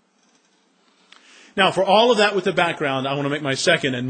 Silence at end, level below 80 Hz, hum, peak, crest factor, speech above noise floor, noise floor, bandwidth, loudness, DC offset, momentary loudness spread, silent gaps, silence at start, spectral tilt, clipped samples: 0 s; -66 dBFS; none; -2 dBFS; 18 dB; 42 dB; -61 dBFS; 10 kHz; -19 LUFS; under 0.1%; 8 LU; none; 1.55 s; -4 dB/octave; under 0.1%